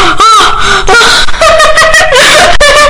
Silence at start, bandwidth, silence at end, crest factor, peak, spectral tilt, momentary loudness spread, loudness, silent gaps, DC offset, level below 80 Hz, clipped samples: 0 s; 12 kHz; 0 s; 2 dB; 0 dBFS; -1 dB/octave; 3 LU; -2 LUFS; none; under 0.1%; -18 dBFS; 20%